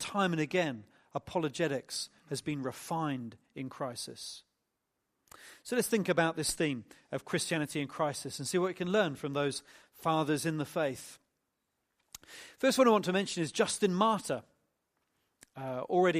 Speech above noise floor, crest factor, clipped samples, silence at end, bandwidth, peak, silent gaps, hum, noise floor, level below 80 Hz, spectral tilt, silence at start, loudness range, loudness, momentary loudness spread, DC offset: 51 dB; 20 dB; under 0.1%; 0 s; 15 kHz; -12 dBFS; none; none; -84 dBFS; -70 dBFS; -4.5 dB/octave; 0 s; 7 LU; -33 LUFS; 15 LU; under 0.1%